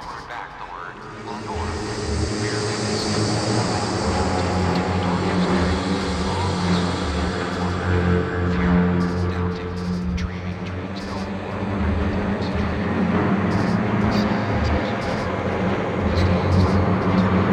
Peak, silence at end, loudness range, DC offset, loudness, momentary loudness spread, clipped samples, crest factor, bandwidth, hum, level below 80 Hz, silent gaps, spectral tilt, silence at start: -6 dBFS; 0 s; 4 LU; under 0.1%; -22 LUFS; 10 LU; under 0.1%; 16 dB; 10 kHz; none; -34 dBFS; none; -6 dB/octave; 0 s